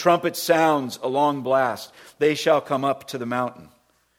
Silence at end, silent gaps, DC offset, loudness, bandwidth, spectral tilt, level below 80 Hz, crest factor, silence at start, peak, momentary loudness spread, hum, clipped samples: 0.55 s; none; under 0.1%; -22 LUFS; 17.5 kHz; -4.5 dB/octave; -68 dBFS; 18 dB; 0 s; -4 dBFS; 9 LU; none; under 0.1%